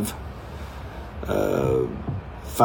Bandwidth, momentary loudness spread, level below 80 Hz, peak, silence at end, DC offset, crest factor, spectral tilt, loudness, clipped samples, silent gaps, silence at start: over 20 kHz; 14 LU; -38 dBFS; -4 dBFS; 0 s; under 0.1%; 22 dB; -6.5 dB/octave; -28 LUFS; under 0.1%; none; 0 s